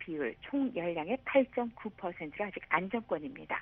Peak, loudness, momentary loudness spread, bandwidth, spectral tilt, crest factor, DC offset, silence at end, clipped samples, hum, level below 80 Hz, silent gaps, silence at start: -14 dBFS; -35 LUFS; 10 LU; 3.9 kHz; -4 dB/octave; 22 dB; under 0.1%; 0 s; under 0.1%; none; -66 dBFS; none; 0 s